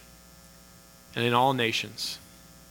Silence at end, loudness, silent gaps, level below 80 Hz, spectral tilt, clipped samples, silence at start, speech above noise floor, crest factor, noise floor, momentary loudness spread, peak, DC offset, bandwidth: 0.45 s; -27 LUFS; none; -62 dBFS; -4 dB/octave; under 0.1%; 1.15 s; 26 dB; 22 dB; -53 dBFS; 14 LU; -8 dBFS; under 0.1%; 18 kHz